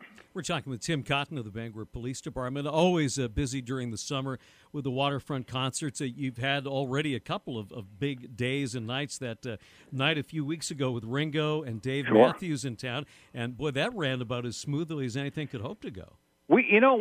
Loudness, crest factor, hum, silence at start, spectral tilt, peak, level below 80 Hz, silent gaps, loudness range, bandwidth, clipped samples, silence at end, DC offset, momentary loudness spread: -30 LUFS; 24 dB; none; 0 s; -5 dB/octave; -6 dBFS; -56 dBFS; none; 5 LU; 15 kHz; under 0.1%; 0 s; under 0.1%; 14 LU